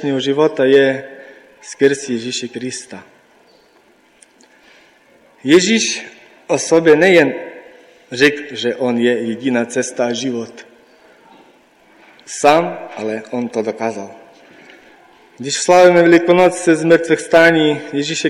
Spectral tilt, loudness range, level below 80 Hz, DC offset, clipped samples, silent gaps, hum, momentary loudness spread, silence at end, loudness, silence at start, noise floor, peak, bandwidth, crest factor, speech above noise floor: -4 dB/octave; 10 LU; -60 dBFS; under 0.1%; under 0.1%; none; none; 18 LU; 0 s; -14 LUFS; 0 s; -52 dBFS; -2 dBFS; 13 kHz; 14 dB; 38 dB